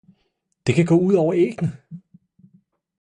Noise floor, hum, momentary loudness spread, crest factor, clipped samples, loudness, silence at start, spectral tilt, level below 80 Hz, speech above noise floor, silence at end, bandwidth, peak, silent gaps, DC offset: -71 dBFS; none; 11 LU; 16 dB; under 0.1%; -19 LUFS; 0.65 s; -7.5 dB/octave; -56 dBFS; 52 dB; 1.05 s; 10 kHz; -6 dBFS; none; under 0.1%